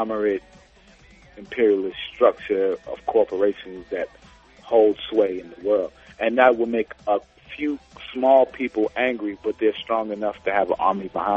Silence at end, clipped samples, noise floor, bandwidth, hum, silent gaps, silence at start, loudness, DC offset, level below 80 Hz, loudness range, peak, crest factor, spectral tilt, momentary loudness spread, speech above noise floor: 0 s; under 0.1%; -52 dBFS; 7.2 kHz; none; none; 0 s; -22 LUFS; under 0.1%; -56 dBFS; 2 LU; -2 dBFS; 20 dB; -6.5 dB/octave; 13 LU; 30 dB